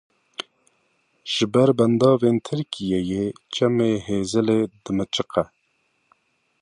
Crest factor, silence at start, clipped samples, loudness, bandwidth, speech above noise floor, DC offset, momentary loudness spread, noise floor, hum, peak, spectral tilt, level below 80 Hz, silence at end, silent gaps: 20 dB; 0.4 s; under 0.1%; -21 LUFS; 11 kHz; 48 dB; under 0.1%; 18 LU; -69 dBFS; none; -4 dBFS; -6 dB/octave; -54 dBFS; 1.15 s; none